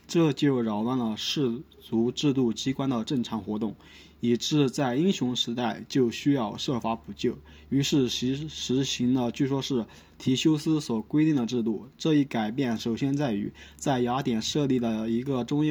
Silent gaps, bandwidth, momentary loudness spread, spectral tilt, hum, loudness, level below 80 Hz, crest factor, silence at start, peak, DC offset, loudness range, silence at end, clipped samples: none; over 20 kHz; 7 LU; -5.5 dB/octave; none; -27 LUFS; -58 dBFS; 16 dB; 0.1 s; -12 dBFS; under 0.1%; 1 LU; 0 s; under 0.1%